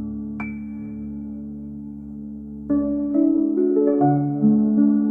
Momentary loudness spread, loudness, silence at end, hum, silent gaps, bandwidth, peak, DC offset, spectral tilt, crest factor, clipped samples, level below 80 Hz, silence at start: 17 LU; -20 LUFS; 0 s; none; none; 2.6 kHz; -6 dBFS; under 0.1%; -13.5 dB/octave; 14 dB; under 0.1%; -50 dBFS; 0 s